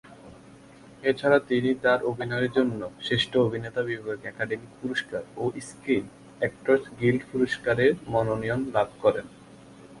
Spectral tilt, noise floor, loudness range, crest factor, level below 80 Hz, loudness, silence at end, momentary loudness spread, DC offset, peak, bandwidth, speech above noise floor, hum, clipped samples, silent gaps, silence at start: -6 dB/octave; -50 dBFS; 4 LU; 20 dB; -58 dBFS; -26 LUFS; 0 s; 10 LU; under 0.1%; -8 dBFS; 11.5 kHz; 24 dB; none; under 0.1%; none; 0.1 s